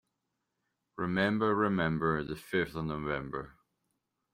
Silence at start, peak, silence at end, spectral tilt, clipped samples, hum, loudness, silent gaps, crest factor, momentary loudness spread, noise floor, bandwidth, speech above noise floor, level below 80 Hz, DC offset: 0.95 s; -16 dBFS; 0.85 s; -7.5 dB/octave; under 0.1%; none; -32 LUFS; none; 18 dB; 13 LU; -84 dBFS; 16 kHz; 52 dB; -58 dBFS; under 0.1%